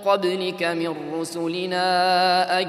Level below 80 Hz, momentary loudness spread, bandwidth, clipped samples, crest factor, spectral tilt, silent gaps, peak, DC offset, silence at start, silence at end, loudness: -78 dBFS; 9 LU; 14.5 kHz; under 0.1%; 16 dB; -4 dB/octave; none; -6 dBFS; under 0.1%; 0 s; 0 s; -22 LUFS